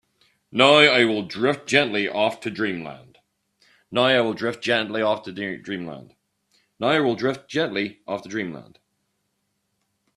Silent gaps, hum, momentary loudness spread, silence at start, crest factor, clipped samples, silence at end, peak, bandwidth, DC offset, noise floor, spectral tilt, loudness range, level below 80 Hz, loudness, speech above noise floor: none; none; 17 LU; 0.55 s; 24 dB; under 0.1%; 1.55 s; 0 dBFS; 12 kHz; under 0.1%; -74 dBFS; -4.5 dB/octave; 7 LU; -66 dBFS; -21 LUFS; 52 dB